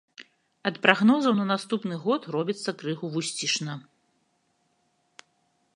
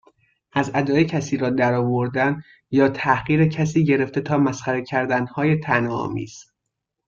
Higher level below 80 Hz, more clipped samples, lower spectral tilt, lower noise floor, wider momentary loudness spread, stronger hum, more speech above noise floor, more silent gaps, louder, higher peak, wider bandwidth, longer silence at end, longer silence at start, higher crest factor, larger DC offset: second, -80 dBFS vs -54 dBFS; neither; second, -4 dB/octave vs -7 dB/octave; second, -71 dBFS vs -80 dBFS; first, 12 LU vs 7 LU; neither; second, 46 dB vs 60 dB; neither; second, -26 LUFS vs -21 LUFS; about the same, -2 dBFS vs -4 dBFS; first, 11.5 kHz vs 7.4 kHz; first, 1.95 s vs 0.65 s; second, 0.2 s vs 0.55 s; first, 26 dB vs 18 dB; neither